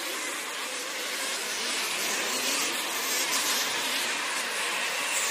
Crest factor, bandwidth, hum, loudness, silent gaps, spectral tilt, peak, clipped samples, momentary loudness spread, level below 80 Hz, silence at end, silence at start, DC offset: 18 dB; 15.5 kHz; none; -27 LUFS; none; 1 dB/octave; -12 dBFS; under 0.1%; 6 LU; -78 dBFS; 0 s; 0 s; under 0.1%